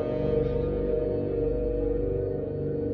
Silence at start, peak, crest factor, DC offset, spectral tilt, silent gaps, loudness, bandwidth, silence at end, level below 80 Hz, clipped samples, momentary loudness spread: 0 s; -14 dBFS; 12 dB; under 0.1%; -11.5 dB/octave; none; -28 LUFS; 4.7 kHz; 0 s; -36 dBFS; under 0.1%; 4 LU